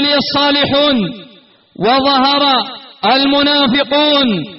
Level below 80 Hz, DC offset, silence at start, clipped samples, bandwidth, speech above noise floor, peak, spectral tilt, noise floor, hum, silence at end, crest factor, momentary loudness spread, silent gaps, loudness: -48 dBFS; under 0.1%; 0 s; under 0.1%; 6 kHz; 32 dB; -2 dBFS; -1.5 dB/octave; -44 dBFS; none; 0 s; 10 dB; 7 LU; none; -11 LUFS